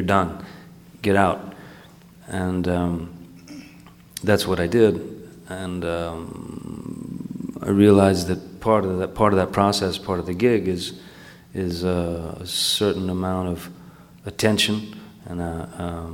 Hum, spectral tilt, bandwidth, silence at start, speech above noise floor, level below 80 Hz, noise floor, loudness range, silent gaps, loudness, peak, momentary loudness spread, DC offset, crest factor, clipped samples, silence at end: none; -5.5 dB/octave; 17 kHz; 0 s; 25 dB; -48 dBFS; -47 dBFS; 6 LU; none; -22 LUFS; -2 dBFS; 20 LU; under 0.1%; 22 dB; under 0.1%; 0 s